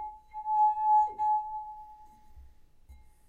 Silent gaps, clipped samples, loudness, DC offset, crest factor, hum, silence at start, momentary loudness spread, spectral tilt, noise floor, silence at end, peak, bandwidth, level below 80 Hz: none; under 0.1%; -28 LUFS; under 0.1%; 14 dB; none; 0 s; 18 LU; -5 dB/octave; -54 dBFS; 0.3 s; -18 dBFS; 6.6 kHz; -58 dBFS